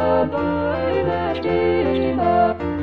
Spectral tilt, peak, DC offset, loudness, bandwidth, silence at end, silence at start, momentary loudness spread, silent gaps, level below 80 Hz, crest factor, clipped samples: -9 dB/octave; -6 dBFS; 0.5%; -20 LUFS; 5.6 kHz; 0 s; 0 s; 4 LU; none; -42 dBFS; 14 dB; under 0.1%